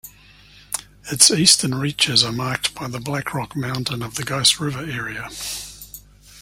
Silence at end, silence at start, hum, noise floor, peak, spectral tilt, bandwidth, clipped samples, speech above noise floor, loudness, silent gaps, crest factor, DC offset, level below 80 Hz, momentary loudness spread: 0 s; 0.05 s; 50 Hz at -45 dBFS; -48 dBFS; 0 dBFS; -2 dB/octave; 16.5 kHz; under 0.1%; 27 dB; -19 LUFS; none; 22 dB; under 0.1%; -50 dBFS; 16 LU